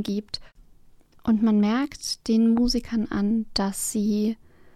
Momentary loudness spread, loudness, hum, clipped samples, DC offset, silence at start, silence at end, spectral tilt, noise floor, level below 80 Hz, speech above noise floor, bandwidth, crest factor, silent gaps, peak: 10 LU; -24 LUFS; none; under 0.1%; under 0.1%; 0 s; 0.4 s; -5 dB/octave; -52 dBFS; -44 dBFS; 29 dB; 14.5 kHz; 14 dB; none; -10 dBFS